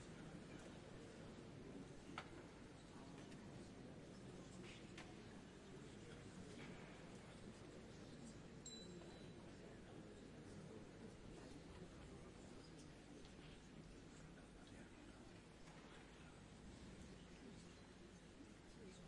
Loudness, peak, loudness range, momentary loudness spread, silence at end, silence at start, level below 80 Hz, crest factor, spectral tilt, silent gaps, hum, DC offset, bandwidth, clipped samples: -60 LUFS; -36 dBFS; 3 LU; 5 LU; 0 s; 0 s; -70 dBFS; 24 dB; -5 dB/octave; none; none; under 0.1%; 11 kHz; under 0.1%